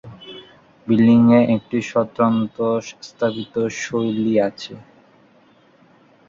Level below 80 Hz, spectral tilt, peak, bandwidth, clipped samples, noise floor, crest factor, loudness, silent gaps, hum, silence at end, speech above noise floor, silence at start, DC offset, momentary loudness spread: -58 dBFS; -6.5 dB/octave; -2 dBFS; 7.4 kHz; under 0.1%; -53 dBFS; 16 dB; -18 LUFS; none; none; 1.45 s; 35 dB; 0.05 s; under 0.1%; 23 LU